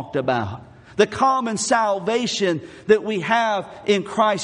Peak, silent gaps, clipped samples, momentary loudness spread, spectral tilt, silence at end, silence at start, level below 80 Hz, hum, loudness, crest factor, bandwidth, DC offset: -2 dBFS; none; under 0.1%; 6 LU; -4 dB/octave; 0 s; 0 s; -60 dBFS; none; -21 LUFS; 18 dB; 11 kHz; under 0.1%